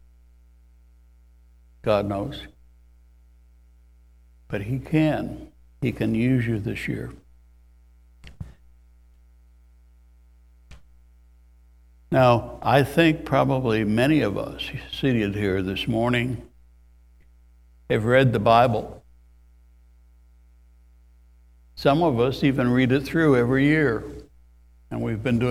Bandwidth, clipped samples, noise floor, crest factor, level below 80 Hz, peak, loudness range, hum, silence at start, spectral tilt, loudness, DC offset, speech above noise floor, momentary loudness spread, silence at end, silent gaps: 15.5 kHz; under 0.1%; -53 dBFS; 22 dB; -46 dBFS; -2 dBFS; 10 LU; none; 1.85 s; -7.5 dB/octave; -22 LUFS; under 0.1%; 32 dB; 16 LU; 0 s; none